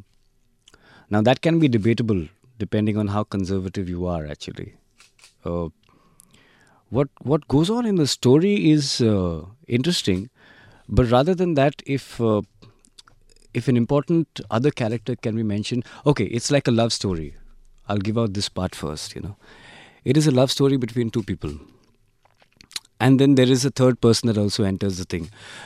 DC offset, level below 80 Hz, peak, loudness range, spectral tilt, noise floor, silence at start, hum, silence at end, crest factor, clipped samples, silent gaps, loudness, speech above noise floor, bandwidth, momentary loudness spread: under 0.1%; -46 dBFS; -2 dBFS; 7 LU; -6 dB/octave; -62 dBFS; 1.1 s; none; 0 s; 20 dB; under 0.1%; none; -21 LUFS; 41 dB; 14 kHz; 15 LU